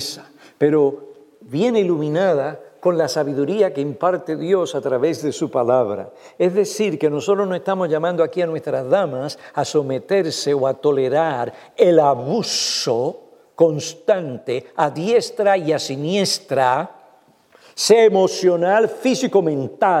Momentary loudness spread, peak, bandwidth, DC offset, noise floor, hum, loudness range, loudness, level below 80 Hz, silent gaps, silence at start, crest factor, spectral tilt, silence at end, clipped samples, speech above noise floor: 8 LU; 0 dBFS; 15 kHz; under 0.1%; -53 dBFS; none; 3 LU; -19 LUFS; -74 dBFS; none; 0 s; 18 dB; -4.5 dB/octave; 0 s; under 0.1%; 35 dB